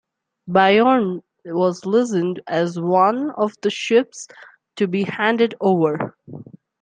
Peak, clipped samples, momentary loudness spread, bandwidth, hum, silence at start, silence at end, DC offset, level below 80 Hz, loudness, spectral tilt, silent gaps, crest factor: -2 dBFS; under 0.1%; 17 LU; 9.6 kHz; none; 0.45 s; 0.4 s; under 0.1%; -68 dBFS; -19 LUFS; -6 dB/octave; none; 18 dB